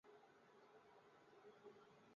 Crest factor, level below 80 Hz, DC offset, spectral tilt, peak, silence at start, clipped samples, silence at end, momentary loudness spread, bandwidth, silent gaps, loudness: 16 dB; under -90 dBFS; under 0.1%; -3.5 dB/octave; -52 dBFS; 0.05 s; under 0.1%; 0 s; 4 LU; 7 kHz; none; -68 LUFS